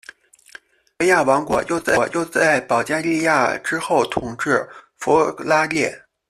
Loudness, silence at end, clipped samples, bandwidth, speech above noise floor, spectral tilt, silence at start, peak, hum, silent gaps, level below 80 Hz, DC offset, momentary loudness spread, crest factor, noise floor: -19 LUFS; 0.35 s; under 0.1%; 14 kHz; 27 dB; -4 dB/octave; 1 s; -2 dBFS; none; none; -54 dBFS; under 0.1%; 7 LU; 16 dB; -46 dBFS